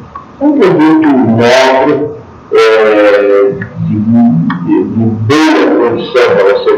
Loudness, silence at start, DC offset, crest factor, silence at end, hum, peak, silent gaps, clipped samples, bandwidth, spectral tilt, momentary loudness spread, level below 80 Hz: -8 LUFS; 0 s; under 0.1%; 8 dB; 0 s; none; 0 dBFS; none; 2%; 11.5 kHz; -6.5 dB/octave; 7 LU; -46 dBFS